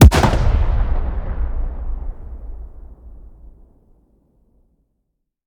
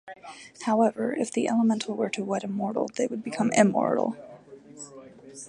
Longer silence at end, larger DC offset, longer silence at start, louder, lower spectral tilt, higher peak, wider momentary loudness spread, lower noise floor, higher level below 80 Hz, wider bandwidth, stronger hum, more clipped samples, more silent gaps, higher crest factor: first, 2.25 s vs 0 s; neither; about the same, 0 s vs 0.05 s; first, -20 LUFS vs -26 LUFS; about the same, -6 dB/octave vs -5 dB/octave; first, 0 dBFS vs -6 dBFS; first, 24 LU vs 21 LU; first, -73 dBFS vs -47 dBFS; first, -20 dBFS vs -72 dBFS; first, 19 kHz vs 11 kHz; neither; neither; neither; about the same, 18 dB vs 22 dB